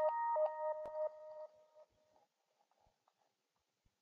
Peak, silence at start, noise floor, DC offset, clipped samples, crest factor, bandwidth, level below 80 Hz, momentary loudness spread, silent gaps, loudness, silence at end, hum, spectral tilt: -26 dBFS; 0 s; -87 dBFS; under 0.1%; under 0.1%; 18 dB; 5 kHz; -88 dBFS; 18 LU; none; -40 LUFS; 2.2 s; none; -1.5 dB/octave